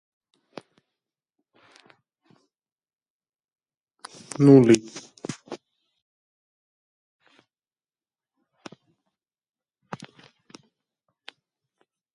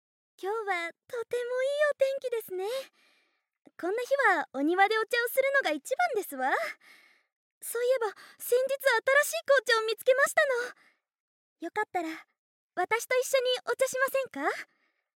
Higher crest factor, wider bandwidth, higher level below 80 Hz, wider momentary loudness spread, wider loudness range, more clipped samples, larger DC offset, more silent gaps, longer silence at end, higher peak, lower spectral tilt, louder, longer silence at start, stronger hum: first, 26 dB vs 20 dB; second, 11.5 kHz vs 17 kHz; first, -70 dBFS vs under -90 dBFS; first, 28 LU vs 13 LU; first, 22 LU vs 5 LU; neither; neither; second, none vs 7.36-7.61 s, 11.20-11.56 s, 12.38-12.69 s; first, 6.6 s vs 0.5 s; first, -4 dBFS vs -10 dBFS; first, -7 dB/octave vs -0.5 dB/octave; first, -17 LUFS vs -28 LUFS; first, 4.4 s vs 0.4 s; neither